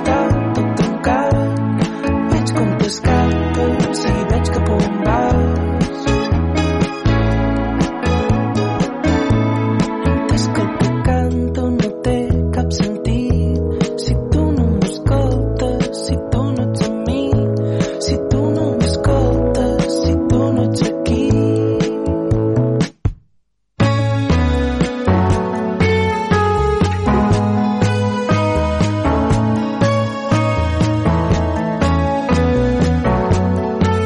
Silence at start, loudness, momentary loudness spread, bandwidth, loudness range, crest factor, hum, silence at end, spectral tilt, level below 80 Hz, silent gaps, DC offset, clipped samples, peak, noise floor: 0 s; -17 LUFS; 3 LU; 11.5 kHz; 2 LU; 10 dB; none; 0 s; -7 dB/octave; -26 dBFS; none; under 0.1%; under 0.1%; -6 dBFS; -59 dBFS